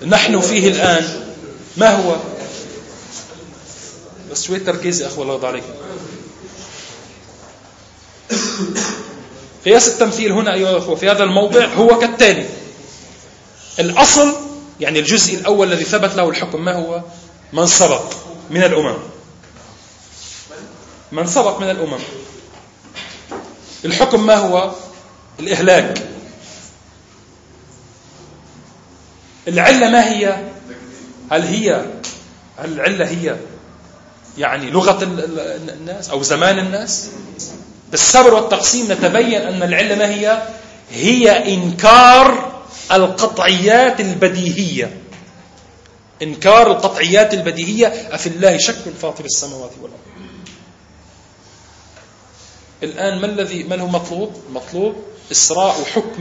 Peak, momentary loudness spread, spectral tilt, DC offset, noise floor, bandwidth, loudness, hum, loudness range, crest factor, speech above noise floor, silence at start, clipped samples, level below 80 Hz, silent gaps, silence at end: 0 dBFS; 22 LU; -3 dB/octave; under 0.1%; -45 dBFS; 11 kHz; -13 LUFS; none; 13 LU; 16 dB; 31 dB; 0 s; 0.1%; -48 dBFS; none; 0 s